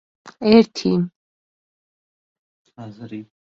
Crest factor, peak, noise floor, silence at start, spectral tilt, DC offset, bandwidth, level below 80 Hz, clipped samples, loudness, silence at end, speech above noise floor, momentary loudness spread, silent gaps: 20 dB; -2 dBFS; under -90 dBFS; 0.25 s; -7 dB/octave; under 0.1%; 7.4 kHz; -58 dBFS; under 0.1%; -18 LUFS; 0.2 s; over 71 dB; 24 LU; 1.16-2.65 s